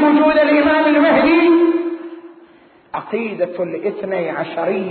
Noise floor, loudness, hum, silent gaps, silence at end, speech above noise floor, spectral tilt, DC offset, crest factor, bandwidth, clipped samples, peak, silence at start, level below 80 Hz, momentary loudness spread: -47 dBFS; -15 LUFS; none; none; 0 s; 30 dB; -10.5 dB/octave; under 0.1%; 12 dB; 4.5 kHz; under 0.1%; -4 dBFS; 0 s; -54 dBFS; 13 LU